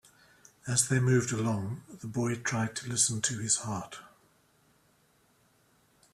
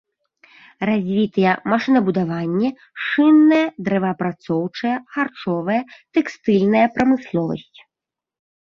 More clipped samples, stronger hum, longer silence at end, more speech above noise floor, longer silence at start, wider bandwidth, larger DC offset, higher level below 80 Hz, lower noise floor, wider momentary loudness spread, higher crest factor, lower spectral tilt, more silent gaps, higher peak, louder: neither; neither; first, 2.05 s vs 1 s; second, 37 dB vs 69 dB; second, 0.65 s vs 0.8 s; first, 14 kHz vs 7 kHz; neither; second, -66 dBFS vs -58 dBFS; second, -67 dBFS vs -87 dBFS; first, 14 LU vs 9 LU; first, 22 dB vs 16 dB; second, -4 dB/octave vs -7.5 dB/octave; neither; second, -12 dBFS vs -2 dBFS; second, -30 LUFS vs -19 LUFS